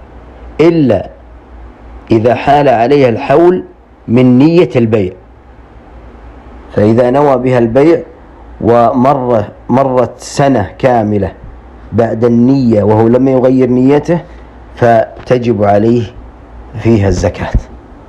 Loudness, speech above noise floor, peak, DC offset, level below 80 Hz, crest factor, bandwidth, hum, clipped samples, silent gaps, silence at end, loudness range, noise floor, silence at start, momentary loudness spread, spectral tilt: -10 LUFS; 28 dB; 0 dBFS; under 0.1%; -32 dBFS; 10 dB; 11 kHz; none; 0.7%; none; 0.15 s; 3 LU; -36 dBFS; 0 s; 9 LU; -8 dB/octave